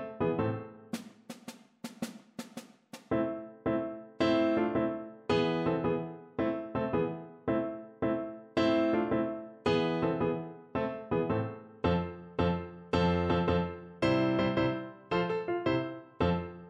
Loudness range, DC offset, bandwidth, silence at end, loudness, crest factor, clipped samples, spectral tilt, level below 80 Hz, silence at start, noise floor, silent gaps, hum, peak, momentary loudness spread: 5 LU; under 0.1%; 13 kHz; 0 s; -32 LUFS; 18 dB; under 0.1%; -7 dB/octave; -54 dBFS; 0 s; -53 dBFS; none; none; -14 dBFS; 14 LU